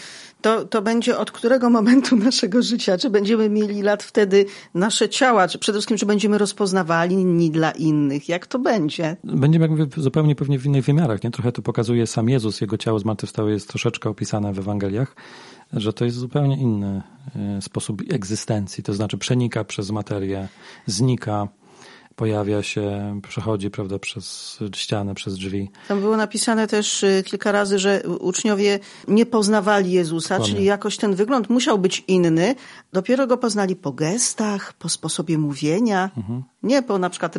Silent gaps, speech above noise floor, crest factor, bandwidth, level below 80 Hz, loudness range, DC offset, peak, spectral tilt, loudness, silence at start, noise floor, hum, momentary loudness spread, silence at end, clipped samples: none; 27 dB; 16 dB; 11.5 kHz; -60 dBFS; 7 LU; under 0.1%; -4 dBFS; -5 dB/octave; -21 LUFS; 0 s; -47 dBFS; none; 10 LU; 0 s; under 0.1%